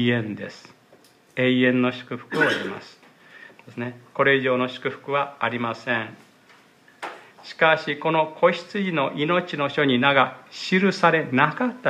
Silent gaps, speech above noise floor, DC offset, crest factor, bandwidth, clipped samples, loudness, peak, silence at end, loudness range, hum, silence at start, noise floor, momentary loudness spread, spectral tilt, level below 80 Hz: none; 32 dB; under 0.1%; 20 dB; 10.5 kHz; under 0.1%; -22 LUFS; -2 dBFS; 0 s; 4 LU; none; 0 s; -55 dBFS; 17 LU; -6 dB/octave; -74 dBFS